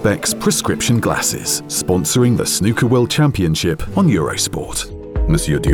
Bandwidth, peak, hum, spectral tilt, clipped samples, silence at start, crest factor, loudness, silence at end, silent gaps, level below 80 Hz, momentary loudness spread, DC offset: 19 kHz; -2 dBFS; none; -4.5 dB/octave; under 0.1%; 0 s; 14 dB; -16 LUFS; 0 s; none; -30 dBFS; 5 LU; under 0.1%